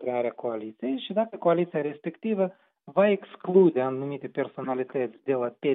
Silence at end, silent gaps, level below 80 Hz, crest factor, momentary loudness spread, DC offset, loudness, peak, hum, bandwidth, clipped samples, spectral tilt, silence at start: 0 s; none; -88 dBFS; 18 dB; 11 LU; under 0.1%; -27 LUFS; -8 dBFS; none; 4 kHz; under 0.1%; -6 dB/octave; 0 s